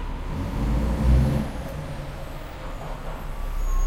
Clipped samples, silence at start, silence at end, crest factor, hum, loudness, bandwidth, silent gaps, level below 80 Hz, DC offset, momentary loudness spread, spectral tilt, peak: under 0.1%; 0 s; 0 s; 18 dB; none; -28 LUFS; 15.5 kHz; none; -26 dBFS; under 0.1%; 15 LU; -7 dB/octave; -8 dBFS